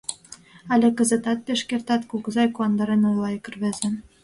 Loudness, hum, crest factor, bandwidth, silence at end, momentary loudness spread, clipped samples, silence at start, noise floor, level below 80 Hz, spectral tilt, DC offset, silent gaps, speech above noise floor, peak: -23 LUFS; none; 16 dB; 11.5 kHz; 0.2 s; 9 LU; under 0.1%; 0.1 s; -47 dBFS; -62 dBFS; -4.5 dB/octave; under 0.1%; none; 25 dB; -8 dBFS